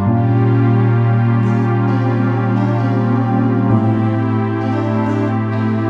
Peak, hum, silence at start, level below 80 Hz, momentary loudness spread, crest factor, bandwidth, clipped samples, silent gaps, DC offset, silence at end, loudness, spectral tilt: 0 dBFS; none; 0 s; -50 dBFS; 4 LU; 14 dB; 5 kHz; under 0.1%; none; under 0.1%; 0 s; -15 LUFS; -10 dB/octave